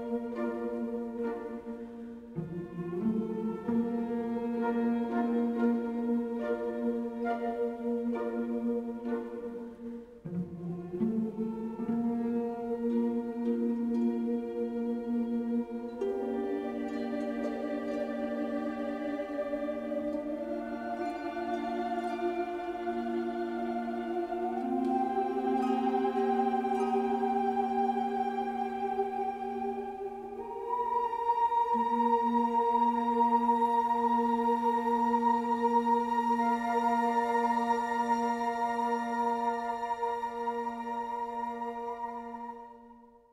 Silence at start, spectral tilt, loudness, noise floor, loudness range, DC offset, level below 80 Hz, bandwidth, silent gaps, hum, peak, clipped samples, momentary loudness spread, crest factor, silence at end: 0 s; -7 dB/octave; -32 LUFS; -55 dBFS; 7 LU; under 0.1%; -66 dBFS; 12 kHz; none; none; -16 dBFS; under 0.1%; 10 LU; 16 dB; 0.25 s